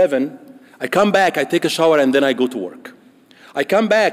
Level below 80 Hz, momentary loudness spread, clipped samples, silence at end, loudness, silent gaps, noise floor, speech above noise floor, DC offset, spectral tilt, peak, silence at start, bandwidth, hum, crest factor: -64 dBFS; 14 LU; under 0.1%; 0 s; -16 LUFS; none; -48 dBFS; 32 dB; under 0.1%; -4.5 dB/octave; -4 dBFS; 0 s; 16 kHz; none; 12 dB